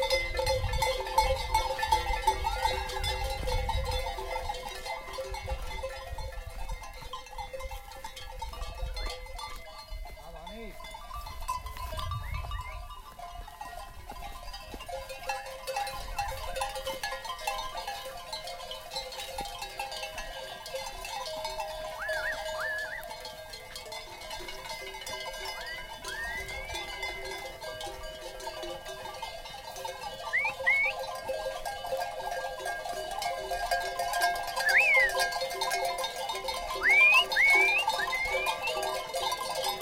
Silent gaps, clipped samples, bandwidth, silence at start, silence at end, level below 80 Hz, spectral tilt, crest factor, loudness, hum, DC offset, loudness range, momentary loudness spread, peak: none; under 0.1%; 17 kHz; 0 s; 0 s; -42 dBFS; -2 dB/octave; 20 dB; -31 LUFS; none; under 0.1%; 17 LU; 16 LU; -12 dBFS